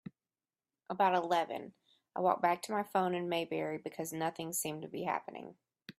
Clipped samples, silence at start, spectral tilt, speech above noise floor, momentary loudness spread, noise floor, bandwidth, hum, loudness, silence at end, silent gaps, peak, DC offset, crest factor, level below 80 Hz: under 0.1%; 0.05 s; -4 dB/octave; over 55 dB; 18 LU; under -90 dBFS; 15.5 kHz; none; -35 LUFS; 0.1 s; none; -16 dBFS; under 0.1%; 20 dB; -82 dBFS